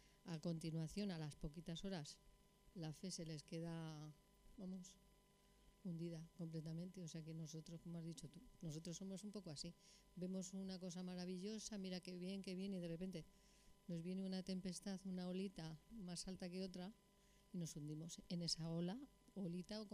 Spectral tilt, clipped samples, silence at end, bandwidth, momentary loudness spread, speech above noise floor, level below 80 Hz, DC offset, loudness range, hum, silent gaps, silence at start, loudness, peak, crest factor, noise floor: -5.5 dB/octave; under 0.1%; 0 s; 13 kHz; 9 LU; 23 dB; -72 dBFS; under 0.1%; 4 LU; 50 Hz at -75 dBFS; none; 0 s; -51 LUFS; -32 dBFS; 20 dB; -74 dBFS